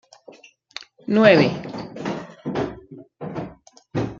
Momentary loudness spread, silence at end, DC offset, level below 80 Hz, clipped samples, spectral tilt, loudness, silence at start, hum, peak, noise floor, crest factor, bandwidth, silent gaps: 24 LU; 0 s; under 0.1%; -56 dBFS; under 0.1%; -6.5 dB/octave; -21 LUFS; 0.3 s; none; -2 dBFS; -48 dBFS; 22 dB; 7.4 kHz; none